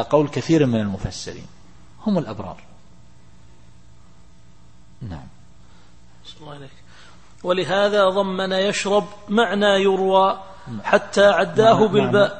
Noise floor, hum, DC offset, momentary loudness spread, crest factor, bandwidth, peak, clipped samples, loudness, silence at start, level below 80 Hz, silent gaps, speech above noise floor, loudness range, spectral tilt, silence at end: -51 dBFS; none; 0.8%; 21 LU; 20 dB; 8.8 kHz; 0 dBFS; under 0.1%; -19 LUFS; 0 s; -50 dBFS; none; 32 dB; 24 LU; -5.5 dB/octave; 0 s